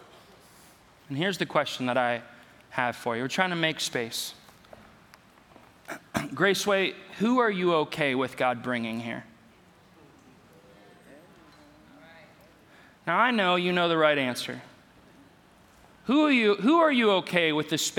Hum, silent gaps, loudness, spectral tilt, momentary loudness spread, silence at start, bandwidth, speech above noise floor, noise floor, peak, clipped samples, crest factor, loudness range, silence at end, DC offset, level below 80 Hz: none; none; -26 LUFS; -4 dB/octave; 14 LU; 1.1 s; 18.5 kHz; 31 dB; -57 dBFS; -6 dBFS; under 0.1%; 22 dB; 7 LU; 0 s; under 0.1%; -70 dBFS